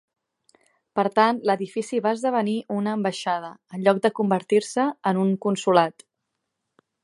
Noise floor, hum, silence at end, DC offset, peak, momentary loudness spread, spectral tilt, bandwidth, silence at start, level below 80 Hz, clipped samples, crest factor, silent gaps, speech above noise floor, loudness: -80 dBFS; none; 1.15 s; under 0.1%; -2 dBFS; 7 LU; -5.5 dB/octave; 11.5 kHz; 0.95 s; -76 dBFS; under 0.1%; 20 dB; none; 58 dB; -23 LUFS